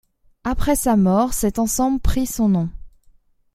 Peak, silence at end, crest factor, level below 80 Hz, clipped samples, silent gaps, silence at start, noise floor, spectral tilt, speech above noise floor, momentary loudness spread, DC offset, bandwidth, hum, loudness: -4 dBFS; 0.65 s; 16 dB; -30 dBFS; under 0.1%; none; 0.45 s; -54 dBFS; -5.5 dB/octave; 36 dB; 9 LU; under 0.1%; 16 kHz; none; -20 LUFS